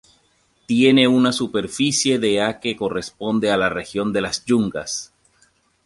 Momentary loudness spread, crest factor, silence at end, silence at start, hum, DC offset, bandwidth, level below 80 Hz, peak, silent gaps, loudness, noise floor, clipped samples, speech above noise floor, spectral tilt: 11 LU; 18 dB; 0.8 s; 0.7 s; none; under 0.1%; 11.5 kHz; -54 dBFS; -2 dBFS; none; -19 LUFS; -62 dBFS; under 0.1%; 43 dB; -4 dB/octave